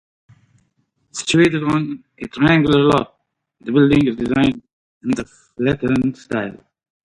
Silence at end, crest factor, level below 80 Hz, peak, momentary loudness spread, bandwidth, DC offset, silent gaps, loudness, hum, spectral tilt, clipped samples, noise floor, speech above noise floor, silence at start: 0.5 s; 16 dB; -46 dBFS; -2 dBFS; 18 LU; 11 kHz; under 0.1%; 4.73-5.01 s; -17 LUFS; none; -6 dB/octave; under 0.1%; -66 dBFS; 49 dB; 1.15 s